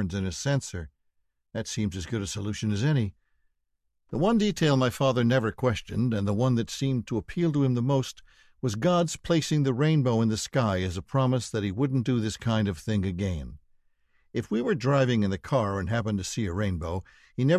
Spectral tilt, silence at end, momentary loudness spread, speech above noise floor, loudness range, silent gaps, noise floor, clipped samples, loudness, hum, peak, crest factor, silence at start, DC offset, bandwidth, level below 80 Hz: -6 dB/octave; 0 s; 10 LU; 50 dB; 4 LU; none; -76 dBFS; under 0.1%; -27 LUFS; none; -12 dBFS; 16 dB; 0 s; under 0.1%; 13.5 kHz; -46 dBFS